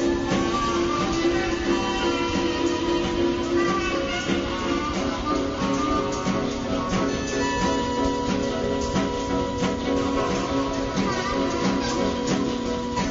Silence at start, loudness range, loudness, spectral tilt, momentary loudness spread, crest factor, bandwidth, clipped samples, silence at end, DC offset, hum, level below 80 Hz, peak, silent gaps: 0 s; 1 LU; -24 LUFS; -5 dB/octave; 2 LU; 14 dB; 8 kHz; under 0.1%; 0 s; under 0.1%; none; -38 dBFS; -10 dBFS; none